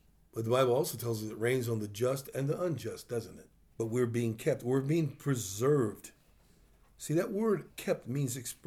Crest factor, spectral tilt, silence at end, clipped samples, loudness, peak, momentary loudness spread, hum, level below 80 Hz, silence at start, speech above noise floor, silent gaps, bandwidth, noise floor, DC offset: 18 dB; -6 dB/octave; 0.15 s; under 0.1%; -33 LUFS; -16 dBFS; 10 LU; none; -68 dBFS; 0.35 s; 31 dB; none; 19.5 kHz; -63 dBFS; under 0.1%